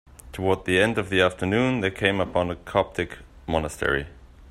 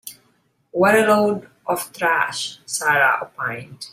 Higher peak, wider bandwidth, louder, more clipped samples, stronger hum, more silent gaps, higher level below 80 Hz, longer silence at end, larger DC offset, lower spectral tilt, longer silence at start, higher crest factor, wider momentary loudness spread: about the same, -4 dBFS vs -4 dBFS; second, 14.5 kHz vs 16 kHz; second, -24 LUFS vs -19 LUFS; neither; neither; neither; first, -46 dBFS vs -64 dBFS; about the same, 0 s vs 0.05 s; neither; first, -5.5 dB/octave vs -3.5 dB/octave; first, 0.25 s vs 0.05 s; about the same, 20 dB vs 16 dB; second, 10 LU vs 13 LU